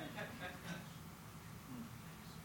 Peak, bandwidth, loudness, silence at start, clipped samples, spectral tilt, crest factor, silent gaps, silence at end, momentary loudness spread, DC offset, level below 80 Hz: -34 dBFS; over 20 kHz; -51 LUFS; 0 s; under 0.1%; -4.5 dB/octave; 16 dB; none; 0 s; 6 LU; under 0.1%; -68 dBFS